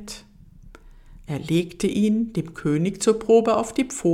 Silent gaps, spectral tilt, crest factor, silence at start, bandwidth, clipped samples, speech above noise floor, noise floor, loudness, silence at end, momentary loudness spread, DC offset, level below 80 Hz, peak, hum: none; -6 dB/octave; 18 dB; 0 s; 15 kHz; under 0.1%; 26 dB; -47 dBFS; -22 LUFS; 0 s; 14 LU; under 0.1%; -50 dBFS; -4 dBFS; none